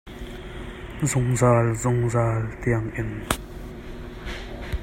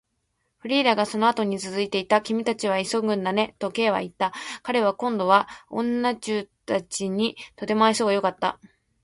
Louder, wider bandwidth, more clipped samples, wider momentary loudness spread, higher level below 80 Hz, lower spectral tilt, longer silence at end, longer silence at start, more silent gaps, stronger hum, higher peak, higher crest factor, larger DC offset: about the same, -24 LUFS vs -24 LUFS; first, 16 kHz vs 11.5 kHz; neither; first, 19 LU vs 8 LU; first, -38 dBFS vs -66 dBFS; first, -6 dB/octave vs -4 dB/octave; second, 0 s vs 0.5 s; second, 0.05 s vs 0.65 s; neither; neither; about the same, -2 dBFS vs -4 dBFS; about the same, 24 dB vs 22 dB; neither